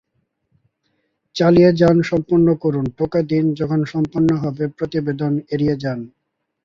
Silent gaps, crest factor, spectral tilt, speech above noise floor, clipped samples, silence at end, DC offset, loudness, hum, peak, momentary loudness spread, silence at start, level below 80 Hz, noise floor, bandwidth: none; 18 dB; -8.5 dB/octave; 52 dB; under 0.1%; 0.6 s; under 0.1%; -18 LUFS; none; -2 dBFS; 11 LU; 1.35 s; -50 dBFS; -69 dBFS; 7.4 kHz